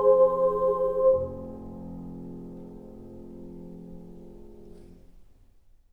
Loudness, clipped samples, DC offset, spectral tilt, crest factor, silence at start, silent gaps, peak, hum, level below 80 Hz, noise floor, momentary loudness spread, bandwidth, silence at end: -24 LUFS; under 0.1%; under 0.1%; -10 dB/octave; 18 dB; 0 s; none; -10 dBFS; none; -50 dBFS; -56 dBFS; 25 LU; 1.7 kHz; 0.7 s